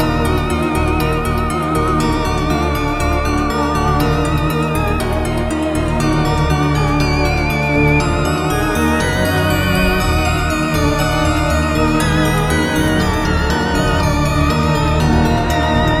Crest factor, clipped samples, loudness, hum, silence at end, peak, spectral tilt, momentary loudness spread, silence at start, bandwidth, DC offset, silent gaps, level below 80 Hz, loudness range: 14 dB; under 0.1%; -15 LUFS; none; 0 s; -2 dBFS; -5.5 dB/octave; 3 LU; 0 s; 16 kHz; under 0.1%; none; -22 dBFS; 2 LU